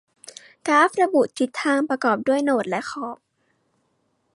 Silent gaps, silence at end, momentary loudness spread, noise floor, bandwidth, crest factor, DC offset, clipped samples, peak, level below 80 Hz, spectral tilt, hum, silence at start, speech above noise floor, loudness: none; 1.2 s; 23 LU; -69 dBFS; 11.5 kHz; 18 dB; under 0.1%; under 0.1%; -6 dBFS; -74 dBFS; -4 dB/octave; none; 0.65 s; 49 dB; -21 LUFS